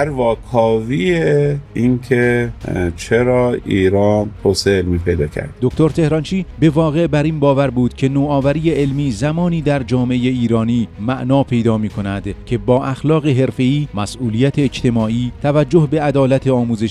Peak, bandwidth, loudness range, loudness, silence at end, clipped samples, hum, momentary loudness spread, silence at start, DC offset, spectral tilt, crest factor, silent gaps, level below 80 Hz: 0 dBFS; 12.5 kHz; 2 LU; -16 LUFS; 0 s; under 0.1%; none; 6 LU; 0 s; under 0.1%; -7 dB/octave; 16 dB; none; -36 dBFS